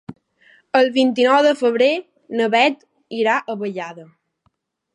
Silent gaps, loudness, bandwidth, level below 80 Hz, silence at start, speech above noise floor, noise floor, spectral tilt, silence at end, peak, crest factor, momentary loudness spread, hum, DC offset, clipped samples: none; -18 LUFS; 10.5 kHz; -70 dBFS; 0.1 s; 50 dB; -67 dBFS; -4.5 dB/octave; 0.9 s; -2 dBFS; 18 dB; 15 LU; none; under 0.1%; under 0.1%